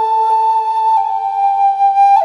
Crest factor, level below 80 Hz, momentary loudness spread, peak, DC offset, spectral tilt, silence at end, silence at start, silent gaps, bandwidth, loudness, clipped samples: 10 dB; -68 dBFS; 4 LU; -2 dBFS; under 0.1%; -1 dB/octave; 0 s; 0 s; none; 10.5 kHz; -13 LUFS; under 0.1%